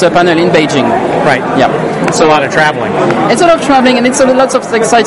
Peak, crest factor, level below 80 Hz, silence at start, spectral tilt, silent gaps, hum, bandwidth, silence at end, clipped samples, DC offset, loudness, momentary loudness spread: 0 dBFS; 8 dB; -42 dBFS; 0 s; -4.5 dB/octave; none; none; 11.5 kHz; 0 s; 0.5%; under 0.1%; -9 LUFS; 4 LU